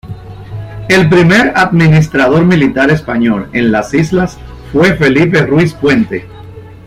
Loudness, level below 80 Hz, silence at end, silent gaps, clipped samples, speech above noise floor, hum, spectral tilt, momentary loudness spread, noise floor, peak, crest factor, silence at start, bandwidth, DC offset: -9 LUFS; -34 dBFS; 0.1 s; none; under 0.1%; 21 dB; none; -6.5 dB/octave; 15 LU; -30 dBFS; 0 dBFS; 10 dB; 0.05 s; 13 kHz; under 0.1%